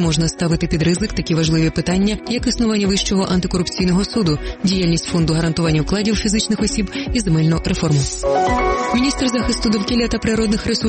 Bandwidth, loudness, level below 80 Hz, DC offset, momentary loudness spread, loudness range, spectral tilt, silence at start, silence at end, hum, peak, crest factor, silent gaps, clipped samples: 8.8 kHz; -18 LUFS; -30 dBFS; under 0.1%; 3 LU; 0 LU; -5 dB/octave; 0 s; 0 s; none; -6 dBFS; 12 dB; none; under 0.1%